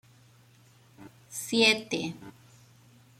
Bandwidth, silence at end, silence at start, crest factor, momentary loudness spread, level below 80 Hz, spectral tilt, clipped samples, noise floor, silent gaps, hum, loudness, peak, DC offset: 15.5 kHz; 0.9 s; 1 s; 24 dB; 18 LU; -72 dBFS; -2.5 dB/octave; under 0.1%; -59 dBFS; none; none; -26 LUFS; -10 dBFS; under 0.1%